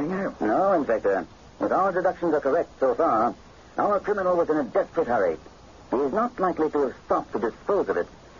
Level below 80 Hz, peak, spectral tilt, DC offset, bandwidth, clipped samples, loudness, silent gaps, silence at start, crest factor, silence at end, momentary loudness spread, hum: -54 dBFS; -10 dBFS; -7.5 dB/octave; under 0.1%; 7.4 kHz; under 0.1%; -25 LUFS; none; 0 s; 14 dB; 0.3 s; 7 LU; none